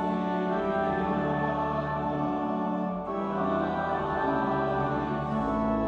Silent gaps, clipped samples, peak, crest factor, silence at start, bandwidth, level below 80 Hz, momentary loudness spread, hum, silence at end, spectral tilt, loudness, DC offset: none; under 0.1%; -16 dBFS; 12 dB; 0 s; 7.4 kHz; -50 dBFS; 3 LU; none; 0 s; -8.5 dB/octave; -29 LUFS; under 0.1%